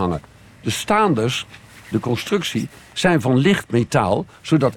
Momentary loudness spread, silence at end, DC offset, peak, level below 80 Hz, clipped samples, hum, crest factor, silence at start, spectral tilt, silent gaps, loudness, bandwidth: 10 LU; 0 s; under 0.1%; -4 dBFS; -50 dBFS; under 0.1%; none; 16 dB; 0 s; -5.5 dB/octave; none; -20 LUFS; 18.5 kHz